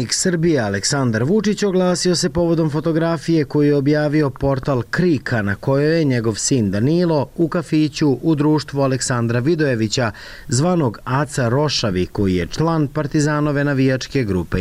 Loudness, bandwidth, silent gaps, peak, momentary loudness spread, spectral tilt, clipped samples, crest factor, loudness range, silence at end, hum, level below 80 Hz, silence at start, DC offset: -18 LUFS; 15 kHz; none; -8 dBFS; 4 LU; -5.5 dB/octave; under 0.1%; 10 dB; 2 LU; 0 s; none; -42 dBFS; 0 s; under 0.1%